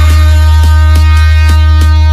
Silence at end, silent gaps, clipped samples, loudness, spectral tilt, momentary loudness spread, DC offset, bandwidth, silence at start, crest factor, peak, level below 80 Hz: 0 s; none; 0.6%; -6 LUFS; -5.5 dB/octave; 0 LU; under 0.1%; 12 kHz; 0 s; 4 dB; 0 dBFS; -6 dBFS